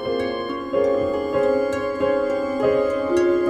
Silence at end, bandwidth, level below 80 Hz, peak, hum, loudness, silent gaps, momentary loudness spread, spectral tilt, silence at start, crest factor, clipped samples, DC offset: 0 s; 10.5 kHz; -52 dBFS; -8 dBFS; none; -22 LUFS; none; 5 LU; -6 dB/octave; 0 s; 12 dB; under 0.1%; under 0.1%